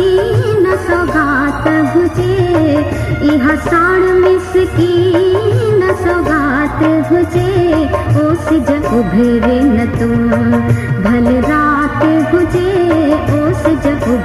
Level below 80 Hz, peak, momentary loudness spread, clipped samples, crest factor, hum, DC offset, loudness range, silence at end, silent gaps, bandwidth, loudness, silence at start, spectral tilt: -28 dBFS; 0 dBFS; 3 LU; under 0.1%; 12 dB; none; under 0.1%; 1 LU; 0 s; none; 13.5 kHz; -12 LUFS; 0 s; -7.5 dB/octave